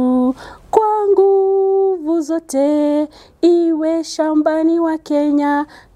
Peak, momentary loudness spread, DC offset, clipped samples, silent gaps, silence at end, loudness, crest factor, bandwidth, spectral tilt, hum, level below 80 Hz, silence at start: 0 dBFS; 6 LU; under 0.1%; under 0.1%; none; 0.3 s; -16 LUFS; 16 dB; 12.5 kHz; -4.5 dB/octave; none; -54 dBFS; 0 s